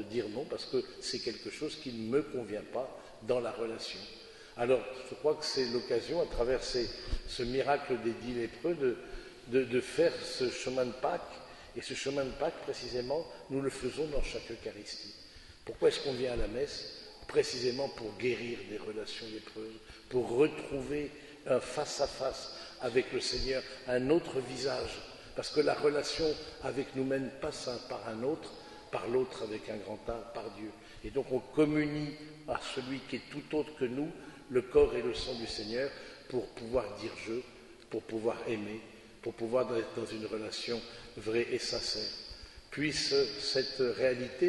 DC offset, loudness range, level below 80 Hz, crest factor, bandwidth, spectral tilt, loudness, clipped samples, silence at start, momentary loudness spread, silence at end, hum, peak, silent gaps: under 0.1%; 4 LU; -52 dBFS; 22 dB; 11.5 kHz; -4.5 dB/octave; -35 LUFS; under 0.1%; 0 s; 13 LU; 0 s; none; -14 dBFS; none